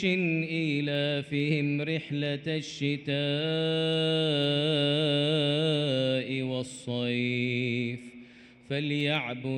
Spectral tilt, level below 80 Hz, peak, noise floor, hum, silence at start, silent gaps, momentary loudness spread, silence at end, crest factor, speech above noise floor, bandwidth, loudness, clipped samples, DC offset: -6 dB/octave; -70 dBFS; -14 dBFS; -52 dBFS; none; 0 s; none; 7 LU; 0 s; 14 dB; 24 dB; 9.6 kHz; -28 LUFS; under 0.1%; under 0.1%